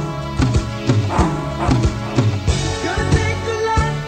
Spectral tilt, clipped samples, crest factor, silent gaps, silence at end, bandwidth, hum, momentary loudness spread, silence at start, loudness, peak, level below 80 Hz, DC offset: -6 dB/octave; under 0.1%; 16 dB; none; 0 s; 9.6 kHz; none; 3 LU; 0 s; -19 LUFS; -2 dBFS; -26 dBFS; under 0.1%